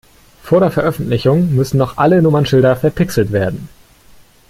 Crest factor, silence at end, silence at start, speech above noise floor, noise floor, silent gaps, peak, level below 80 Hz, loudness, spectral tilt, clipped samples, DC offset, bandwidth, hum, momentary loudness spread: 12 dB; 0.85 s; 0.45 s; 31 dB; -44 dBFS; none; -2 dBFS; -40 dBFS; -14 LUFS; -7.5 dB/octave; under 0.1%; under 0.1%; 16 kHz; none; 6 LU